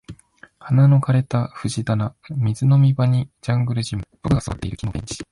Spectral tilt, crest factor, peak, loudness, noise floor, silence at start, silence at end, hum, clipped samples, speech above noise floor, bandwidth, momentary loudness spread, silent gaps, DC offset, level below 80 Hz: -7 dB/octave; 14 dB; -6 dBFS; -20 LUFS; -49 dBFS; 0.1 s; 0.1 s; none; under 0.1%; 30 dB; 11.5 kHz; 13 LU; none; under 0.1%; -42 dBFS